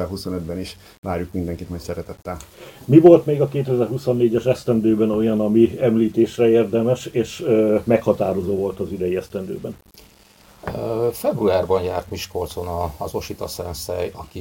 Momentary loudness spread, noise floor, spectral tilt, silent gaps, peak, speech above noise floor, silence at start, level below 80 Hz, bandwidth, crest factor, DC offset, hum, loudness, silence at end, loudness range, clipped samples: 15 LU; -50 dBFS; -7 dB/octave; 0.98-1.03 s; 0 dBFS; 31 dB; 0 s; -46 dBFS; 17 kHz; 20 dB; under 0.1%; none; -20 LUFS; 0 s; 7 LU; under 0.1%